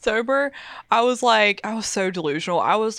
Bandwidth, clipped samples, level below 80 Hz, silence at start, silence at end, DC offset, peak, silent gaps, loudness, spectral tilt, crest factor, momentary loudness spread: 13.5 kHz; under 0.1%; -58 dBFS; 0.05 s; 0 s; under 0.1%; -4 dBFS; none; -21 LUFS; -3 dB/octave; 18 dB; 8 LU